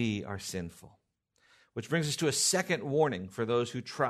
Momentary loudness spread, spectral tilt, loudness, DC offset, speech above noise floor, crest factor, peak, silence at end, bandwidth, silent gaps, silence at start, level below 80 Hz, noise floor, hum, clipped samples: 13 LU; -3.5 dB/octave; -31 LUFS; under 0.1%; 41 dB; 18 dB; -14 dBFS; 0 s; 13.5 kHz; none; 0 s; -70 dBFS; -72 dBFS; none; under 0.1%